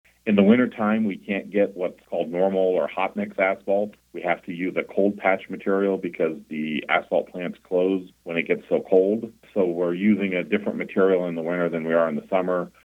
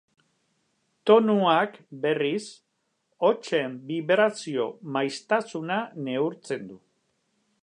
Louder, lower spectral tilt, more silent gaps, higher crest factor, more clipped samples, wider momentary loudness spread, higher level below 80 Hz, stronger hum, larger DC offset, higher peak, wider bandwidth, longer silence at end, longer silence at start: about the same, -24 LUFS vs -26 LUFS; first, -8 dB/octave vs -5.5 dB/octave; neither; about the same, 18 dB vs 22 dB; neither; second, 8 LU vs 12 LU; first, -68 dBFS vs -82 dBFS; neither; neither; about the same, -4 dBFS vs -4 dBFS; second, 4.1 kHz vs 10 kHz; second, 0.15 s vs 0.85 s; second, 0.25 s vs 1.05 s